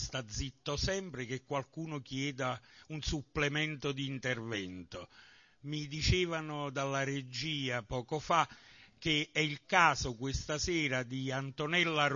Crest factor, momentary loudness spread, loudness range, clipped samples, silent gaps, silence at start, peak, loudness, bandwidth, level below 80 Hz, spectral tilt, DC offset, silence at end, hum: 24 dB; 11 LU; 5 LU; under 0.1%; none; 0 s; -12 dBFS; -34 LUFS; 7.2 kHz; -50 dBFS; -3 dB/octave; under 0.1%; 0 s; none